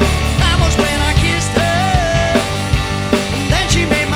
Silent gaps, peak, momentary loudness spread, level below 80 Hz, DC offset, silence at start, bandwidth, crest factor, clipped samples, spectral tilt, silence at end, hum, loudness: none; 0 dBFS; 3 LU; -20 dBFS; 0.2%; 0 s; over 20 kHz; 14 dB; under 0.1%; -4.5 dB/octave; 0 s; none; -14 LUFS